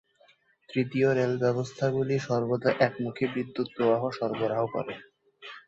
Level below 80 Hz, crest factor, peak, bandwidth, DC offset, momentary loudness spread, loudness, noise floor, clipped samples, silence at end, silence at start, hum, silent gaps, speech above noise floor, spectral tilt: -68 dBFS; 20 dB; -8 dBFS; 7.8 kHz; under 0.1%; 9 LU; -28 LUFS; -63 dBFS; under 0.1%; 0.1 s; 0.7 s; none; none; 36 dB; -7 dB/octave